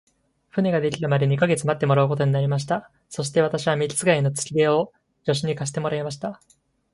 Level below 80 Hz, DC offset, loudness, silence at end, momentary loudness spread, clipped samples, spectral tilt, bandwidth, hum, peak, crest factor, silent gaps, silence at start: -60 dBFS; under 0.1%; -23 LUFS; 0.6 s; 10 LU; under 0.1%; -5.5 dB/octave; 11.5 kHz; none; -4 dBFS; 18 dB; none; 0.55 s